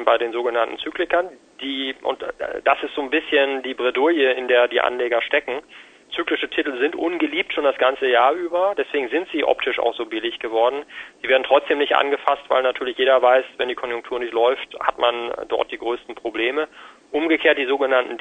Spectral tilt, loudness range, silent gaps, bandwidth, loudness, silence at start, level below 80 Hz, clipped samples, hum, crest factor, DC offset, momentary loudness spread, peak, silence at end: -3.5 dB/octave; 3 LU; none; 9 kHz; -21 LUFS; 0 s; -60 dBFS; under 0.1%; none; 20 dB; under 0.1%; 10 LU; 0 dBFS; 0 s